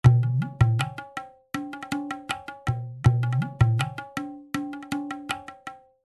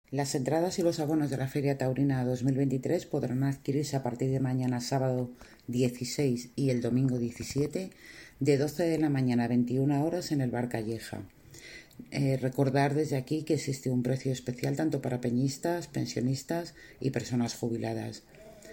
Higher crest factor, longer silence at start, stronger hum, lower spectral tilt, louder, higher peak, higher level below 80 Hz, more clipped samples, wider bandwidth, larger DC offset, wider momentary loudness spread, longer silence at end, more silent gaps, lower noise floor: first, 22 dB vs 16 dB; about the same, 0.05 s vs 0.1 s; neither; about the same, -6.5 dB/octave vs -6.5 dB/octave; first, -27 LUFS vs -30 LUFS; first, -4 dBFS vs -14 dBFS; first, -42 dBFS vs -62 dBFS; neither; second, 12 kHz vs 17 kHz; neither; about the same, 13 LU vs 11 LU; first, 0.3 s vs 0 s; neither; second, -44 dBFS vs -50 dBFS